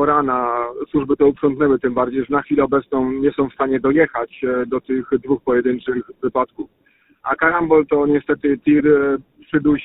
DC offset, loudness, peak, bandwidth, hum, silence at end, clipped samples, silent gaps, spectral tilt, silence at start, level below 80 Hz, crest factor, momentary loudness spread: under 0.1%; -18 LUFS; -2 dBFS; 4 kHz; none; 0 s; under 0.1%; none; -12 dB/octave; 0 s; -48 dBFS; 16 dB; 8 LU